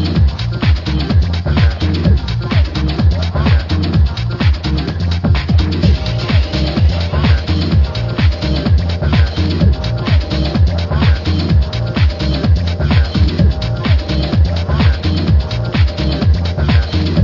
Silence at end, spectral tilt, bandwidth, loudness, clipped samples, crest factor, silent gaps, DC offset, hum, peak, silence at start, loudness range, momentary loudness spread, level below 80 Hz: 0 s; -7.5 dB/octave; 6 kHz; -14 LUFS; under 0.1%; 12 dB; none; under 0.1%; none; 0 dBFS; 0 s; 1 LU; 3 LU; -18 dBFS